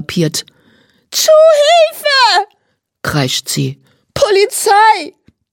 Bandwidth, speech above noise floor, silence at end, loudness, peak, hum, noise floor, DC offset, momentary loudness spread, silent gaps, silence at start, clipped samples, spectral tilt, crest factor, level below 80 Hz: 17.5 kHz; 53 dB; 0.4 s; -11 LUFS; 0 dBFS; none; -64 dBFS; under 0.1%; 15 LU; none; 0 s; under 0.1%; -3 dB/octave; 12 dB; -48 dBFS